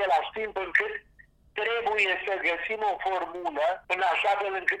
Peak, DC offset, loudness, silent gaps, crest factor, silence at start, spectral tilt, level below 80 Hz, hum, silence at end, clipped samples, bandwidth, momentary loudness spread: -8 dBFS; under 0.1%; -27 LUFS; none; 20 dB; 0 s; -2.5 dB/octave; -62 dBFS; none; 0 s; under 0.1%; 12.5 kHz; 8 LU